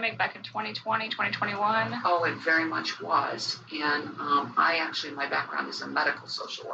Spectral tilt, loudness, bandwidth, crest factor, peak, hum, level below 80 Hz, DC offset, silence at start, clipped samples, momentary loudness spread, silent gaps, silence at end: -3.5 dB/octave; -28 LUFS; 8.8 kHz; 18 dB; -10 dBFS; none; -80 dBFS; under 0.1%; 0 s; under 0.1%; 7 LU; none; 0 s